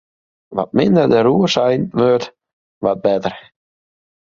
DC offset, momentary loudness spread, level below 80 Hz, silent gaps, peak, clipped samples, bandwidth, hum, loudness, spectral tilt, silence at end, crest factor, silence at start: under 0.1%; 12 LU; -54 dBFS; 2.53-2.81 s; -2 dBFS; under 0.1%; 7.6 kHz; none; -16 LUFS; -6.5 dB/octave; 0.9 s; 16 dB; 0.5 s